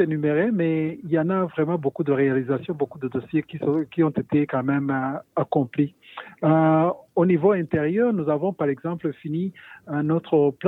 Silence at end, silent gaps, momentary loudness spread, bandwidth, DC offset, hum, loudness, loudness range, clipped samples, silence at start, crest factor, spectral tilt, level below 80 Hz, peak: 0 s; none; 9 LU; 4 kHz; under 0.1%; none; -23 LUFS; 3 LU; under 0.1%; 0 s; 16 dB; -10.5 dB/octave; -64 dBFS; -6 dBFS